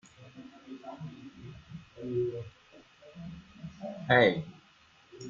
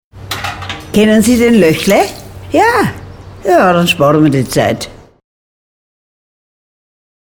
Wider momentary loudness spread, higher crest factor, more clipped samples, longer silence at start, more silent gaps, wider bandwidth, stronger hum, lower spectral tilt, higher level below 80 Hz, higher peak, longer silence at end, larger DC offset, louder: first, 27 LU vs 13 LU; first, 26 dB vs 12 dB; neither; about the same, 0.2 s vs 0.15 s; neither; second, 7.4 kHz vs over 20 kHz; neither; first, -6.5 dB/octave vs -5 dB/octave; second, -66 dBFS vs -38 dBFS; second, -10 dBFS vs 0 dBFS; second, 0 s vs 2.25 s; neither; second, -30 LUFS vs -11 LUFS